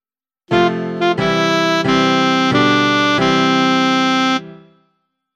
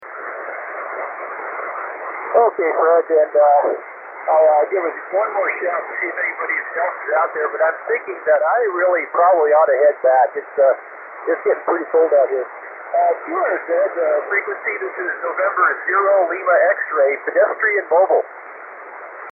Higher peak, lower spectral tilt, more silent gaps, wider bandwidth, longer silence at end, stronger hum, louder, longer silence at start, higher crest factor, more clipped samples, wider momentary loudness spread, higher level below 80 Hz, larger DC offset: about the same, 0 dBFS vs -2 dBFS; second, -4.5 dB/octave vs -8.5 dB/octave; neither; first, 12.5 kHz vs 2.8 kHz; first, 0.8 s vs 0 s; neither; first, -14 LUFS vs -18 LUFS; first, 0.5 s vs 0 s; about the same, 14 dB vs 16 dB; neither; second, 5 LU vs 14 LU; first, -50 dBFS vs -86 dBFS; neither